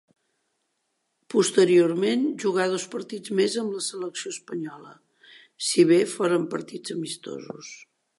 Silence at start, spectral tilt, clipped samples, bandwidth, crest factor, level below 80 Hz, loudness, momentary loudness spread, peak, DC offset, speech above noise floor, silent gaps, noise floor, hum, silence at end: 1.3 s; -4.5 dB/octave; under 0.1%; 11.5 kHz; 20 dB; -80 dBFS; -24 LUFS; 16 LU; -6 dBFS; under 0.1%; 52 dB; none; -76 dBFS; none; 0.4 s